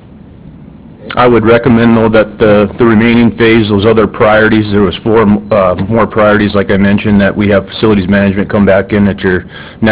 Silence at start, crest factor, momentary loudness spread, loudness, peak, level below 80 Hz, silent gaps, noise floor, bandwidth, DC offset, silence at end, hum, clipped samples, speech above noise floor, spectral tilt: 0.45 s; 8 dB; 4 LU; -8 LUFS; 0 dBFS; -30 dBFS; none; -32 dBFS; 4 kHz; under 0.1%; 0 s; none; 2%; 25 dB; -11 dB/octave